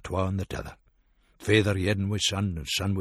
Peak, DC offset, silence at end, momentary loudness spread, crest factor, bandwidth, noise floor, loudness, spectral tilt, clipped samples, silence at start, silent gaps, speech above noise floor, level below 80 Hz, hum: -6 dBFS; under 0.1%; 0 s; 14 LU; 22 dB; 13.5 kHz; -64 dBFS; -27 LUFS; -4.5 dB/octave; under 0.1%; 0.05 s; none; 38 dB; -48 dBFS; none